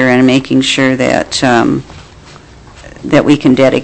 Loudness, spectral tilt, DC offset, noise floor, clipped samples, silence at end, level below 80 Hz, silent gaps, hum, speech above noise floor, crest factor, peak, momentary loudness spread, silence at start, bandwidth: -10 LUFS; -5 dB/octave; under 0.1%; -36 dBFS; under 0.1%; 0 s; -40 dBFS; none; none; 26 dB; 10 dB; 0 dBFS; 6 LU; 0 s; 8.6 kHz